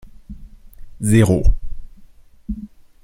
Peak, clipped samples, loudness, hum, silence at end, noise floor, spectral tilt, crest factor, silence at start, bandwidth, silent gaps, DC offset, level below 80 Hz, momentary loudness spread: -2 dBFS; under 0.1%; -18 LUFS; none; 0.4 s; -44 dBFS; -7 dB/octave; 18 dB; 0.05 s; 16 kHz; none; under 0.1%; -24 dBFS; 27 LU